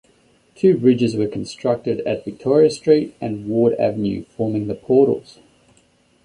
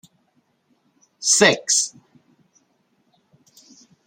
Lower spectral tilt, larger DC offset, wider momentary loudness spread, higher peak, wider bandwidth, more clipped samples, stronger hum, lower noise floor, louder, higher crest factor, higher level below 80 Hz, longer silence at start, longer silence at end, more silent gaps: first, -7.5 dB/octave vs -1 dB/octave; neither; about the same, 9 LU vs 11 LU; about the same, -2 dBFS vs -2 dBFS; second, 10.5 kHz vs 16 kHz; neither; neither; second, -58 dBFS vs -66 dBFS; about the same, -19 LUFS vs -17 LUFS; second, 16 dB vs 24 dB; first, -54 dBFS vs -70 dBFS; second, 0.65 s vs 1.2 s; second, 1.05 s vs 2.2 s; neither